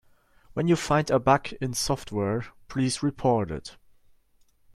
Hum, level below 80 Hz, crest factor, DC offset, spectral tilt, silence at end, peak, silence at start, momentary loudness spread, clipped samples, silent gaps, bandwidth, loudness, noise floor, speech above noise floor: none; -50 dBFS; 20 dB; under 0.1%; -5.5 dB/octave; 1 s; -6 dBFS; 0.55 s; 12 LU; under 0.1%; none; 15 kHz; -26 LUFS; -62 dBFS; 37 dB